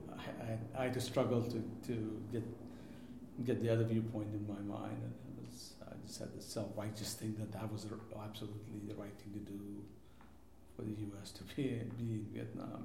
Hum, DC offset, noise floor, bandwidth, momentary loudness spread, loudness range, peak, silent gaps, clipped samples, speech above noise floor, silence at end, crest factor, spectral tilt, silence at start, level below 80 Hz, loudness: none; under 0.1%; -62 dBFS; 16.5 kHz; 15 LU; 9 LU; -20 dBFS; none; under 0.1%; 20 dB; 0 s; 22 dB; -6.5 dB/octave; 0 s; -68 dBFS; -43 LUFS